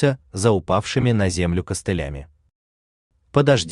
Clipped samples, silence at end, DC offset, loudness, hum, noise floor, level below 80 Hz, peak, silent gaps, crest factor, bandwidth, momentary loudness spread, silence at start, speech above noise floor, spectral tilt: under 0.1%; 0 s; under 0.1%; -21 LUFS; none; under -90 dBFS; -42 dBFS; -2 dBFS; 2.55-3.10 s; 18 dB; 12.5 kHz; 8 LU; 0 s; over 70 dB; -5.5 dB/octave